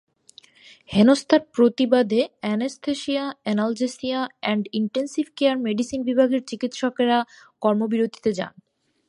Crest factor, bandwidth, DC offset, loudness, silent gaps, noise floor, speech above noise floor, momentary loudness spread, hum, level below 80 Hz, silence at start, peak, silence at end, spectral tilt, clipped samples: 18 dB; 11.5 kHz; under 0.1%; -22 LUFS; none; -53 dBFS; 31 dB; 9 LU; none; -62 dBFS; 0.9 s; -4 dBFS; 0.6 s; -5.5 dB/octave; under 0.1%